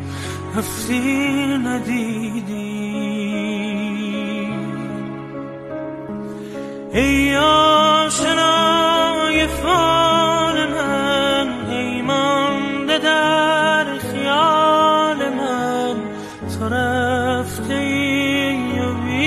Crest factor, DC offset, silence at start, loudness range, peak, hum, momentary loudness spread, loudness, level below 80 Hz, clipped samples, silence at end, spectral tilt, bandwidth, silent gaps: 14 dB; under 0.1%; 0 s; 9 LU; -4 dBFS; none; 14 LU; -18 LUFS; -42 dBFS; under 0.1%; 0 s; -4 dB/octave; 14 kHz; none